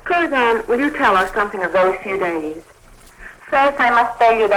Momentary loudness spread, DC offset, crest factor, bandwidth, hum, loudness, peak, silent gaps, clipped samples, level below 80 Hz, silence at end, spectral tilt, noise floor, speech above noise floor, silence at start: 7 LU; under 0.1%; 14 dB; 17 kHz; none; -16 LUFS; -4 dBFS; none; under 0.1%; -46 dBFS; 0 s; -4.5 dB/octave; -44 dBFS; 28 dB; 0.05 s